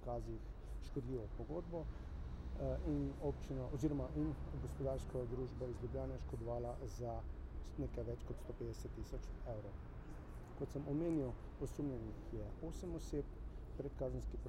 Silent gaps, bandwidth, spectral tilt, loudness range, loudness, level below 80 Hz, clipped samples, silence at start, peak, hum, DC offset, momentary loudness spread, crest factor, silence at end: none; 15 kHz; -8 dB/octave; 5 LU; -46 LUFS; -50 dBFS; under 0.1%; 0 s; -28 dBFS; none; under 0.1%; 10 LU; 18 dB; 0 s